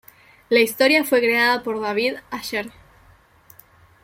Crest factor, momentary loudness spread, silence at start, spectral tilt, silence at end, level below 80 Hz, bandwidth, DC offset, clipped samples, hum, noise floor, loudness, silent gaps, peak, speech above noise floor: 18 dB; 12 LU; 0.5 s; -3 dB/octave; 1.35 s; -60 dBFS; 16.5 kHz; under 0.1%; under 0.1%; none; -53 dBFS; -19 LUFS; none; -4 dBFS; 34 dB